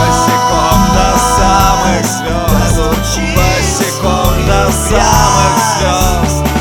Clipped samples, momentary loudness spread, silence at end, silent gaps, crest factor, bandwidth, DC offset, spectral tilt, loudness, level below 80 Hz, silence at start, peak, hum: 0.5%; 4 LU; 0 s; none; 10 dB; over 20 kHz; 0.6%; -4 dB/octave; -10 LUFS; -18 dBFS; 0 s; 0 dBFS; none